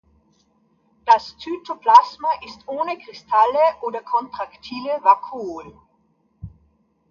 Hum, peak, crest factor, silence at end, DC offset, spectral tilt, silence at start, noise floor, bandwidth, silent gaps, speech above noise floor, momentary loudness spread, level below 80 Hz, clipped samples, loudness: none; 0 dBFS; 20 dB; 0.65 s; under 0.1%; -4.5 dB/octave; 1.05 s; -64 dBFS; 7.2 kHz; none; 44 dB; 18 LU; -58 dBFS; under 0.1%; -19 LUFS